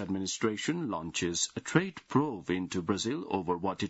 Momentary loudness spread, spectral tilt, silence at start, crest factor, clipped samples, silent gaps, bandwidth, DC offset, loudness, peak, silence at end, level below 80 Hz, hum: 4 LU; -4 dB/octave; 0 s; 22 dB; under 0.1%; none; 8 kHz; under 0.1%; -32 LUFS; -10 dBFS; 0 s; -66 dBFS; none